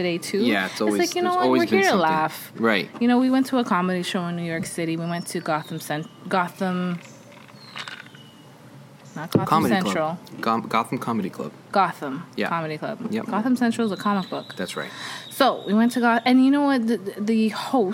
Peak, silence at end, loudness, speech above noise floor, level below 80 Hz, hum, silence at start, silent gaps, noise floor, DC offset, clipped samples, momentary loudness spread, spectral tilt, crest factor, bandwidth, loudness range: -4 dBFS; 0 s; -23 LUFS; 24 dB; -70 dBFS; none; 0 s; none; -46 dBFS; under 0.1%; under 0.1%; 13 LU; -5.5 dB/octave; 18 dB; 17 kHz; 7 LU